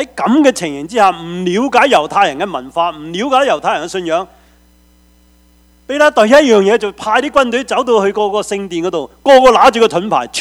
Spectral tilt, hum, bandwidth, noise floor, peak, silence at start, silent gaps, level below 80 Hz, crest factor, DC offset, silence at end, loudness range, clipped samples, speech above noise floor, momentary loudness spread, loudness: -4 dB/octave; none; 15.5 kHz; -48 dBFS; 0 dBFS; 0 s; none; -46 dBFS; 12 dB; under 0.1%; 0 s; 6 LU; 0.4%; 36 dB; 12 LU; -12 LUFS